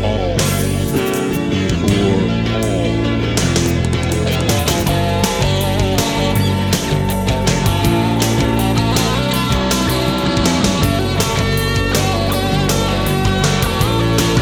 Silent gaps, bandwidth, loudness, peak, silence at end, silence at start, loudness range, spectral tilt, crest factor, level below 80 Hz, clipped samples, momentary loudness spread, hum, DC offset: none; 19.5 kHz; -16 LUFS; 0 dBFS; 0 s; 0 s; 1 LU; -5 dB/octave; 14 dB; -26 dBFS; under 0.1%; 2 LU; none; under 0.1%